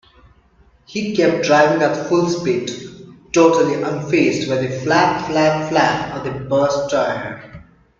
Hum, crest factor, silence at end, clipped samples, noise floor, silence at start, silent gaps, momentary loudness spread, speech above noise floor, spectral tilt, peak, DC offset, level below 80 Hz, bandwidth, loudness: none; 18 dB; 0.4 s; under 0.1%; -53 dBFS; 0.9 s; none; 12 LU; 36 dB; -5 dB/octave; 0 dBFS; under 0.1%; -52 dBFS; 7.6 kHz; -17 LUFS